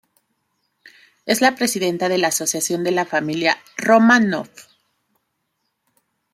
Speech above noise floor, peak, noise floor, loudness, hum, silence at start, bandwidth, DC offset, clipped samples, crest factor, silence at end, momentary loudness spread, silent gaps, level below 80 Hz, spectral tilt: 55 dB; -2 dBFS; -73 dBFS; -18 LUFS; none; 1.25 s; 15.5 kHz; under 0.1%; under 0.1%; 20 dB; 1.7 s; 9 LU; none; -66 dBFS; -3.5 dB/octave